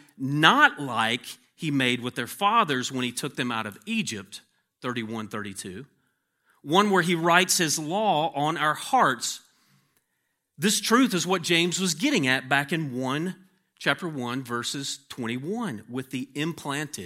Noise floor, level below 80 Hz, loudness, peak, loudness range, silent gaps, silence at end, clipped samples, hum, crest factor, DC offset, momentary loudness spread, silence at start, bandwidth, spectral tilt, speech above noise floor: -77 dBFS; -76 dBFS; -25 LUFS; -2 dBFS; 7 LU; none; 0 s; under 0.1%; none; 26 dB; under 0.1%; 14 LU; 0.2 s; 16.5 kHz; -3.5 dB/octave; 51 dB